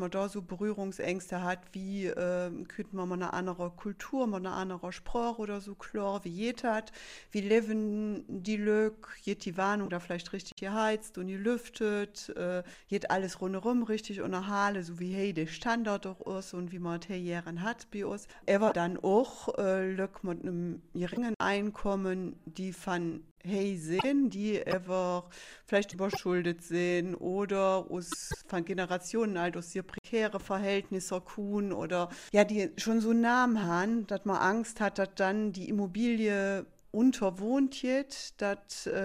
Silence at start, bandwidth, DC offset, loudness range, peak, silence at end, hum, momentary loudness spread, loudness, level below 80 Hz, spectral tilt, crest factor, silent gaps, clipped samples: 0 s; 15 kHz; under 0.1%; 6 LU; -10 dBFS; 0 s; none; 10 LU; -33 LUFS; -60 dBFS; -5.5 dB/octave; 22 dB; 10.52-10.57 s, 21.36-21.40 s, 23.31-23.36 s, 29.98-30.04 s; under 0.1%